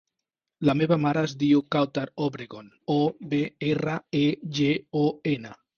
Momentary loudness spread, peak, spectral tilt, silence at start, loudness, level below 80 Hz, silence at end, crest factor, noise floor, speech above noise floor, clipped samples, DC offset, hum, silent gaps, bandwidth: 8 LU; -8 dBFS; -7 dB/octave; 0.6 s; -26 LUFS; -62 dBFS; 0.25 s; 18 dB; -86 dBFS; 61 dB; under 0.1%; under 0.1%; none; none; 6.8 kHz